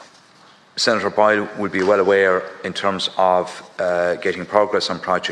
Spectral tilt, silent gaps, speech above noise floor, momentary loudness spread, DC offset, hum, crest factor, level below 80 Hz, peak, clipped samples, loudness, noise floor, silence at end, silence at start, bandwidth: -4 dB/octave; none; 31 dB; 8 LU; under 0.1%; none; 20 dB; -64 dBFS; 0 dBFS; under 0.1%; -19 LUFS; -49 dBFS; 0 s; 0 s; 11.5 kHz